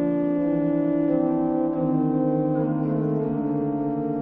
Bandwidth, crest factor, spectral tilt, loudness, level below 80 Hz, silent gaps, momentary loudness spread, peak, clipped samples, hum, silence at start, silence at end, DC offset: 3.4 kHz; 12 dB; -12.5 dB/octave; -24 LUFS; -54 dBFS; none; 3 LU; -10 dBFS; under 0.1%; none; 0 s; 0 s; under 0.1%